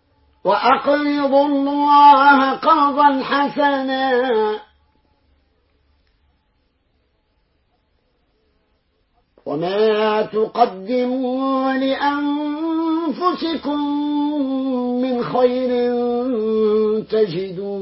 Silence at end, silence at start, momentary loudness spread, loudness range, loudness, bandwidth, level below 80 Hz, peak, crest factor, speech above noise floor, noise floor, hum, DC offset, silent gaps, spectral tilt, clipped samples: 0 s; 0.45 s; 8 LU; 10 LU; -17 LUFS; 5.8 kHz; -60 dBFS; 0 dBFS; 18 dB; 48 dB; -64 dBFS; none; under 0.1%; none; -9.5 dB/octave; under 0.1%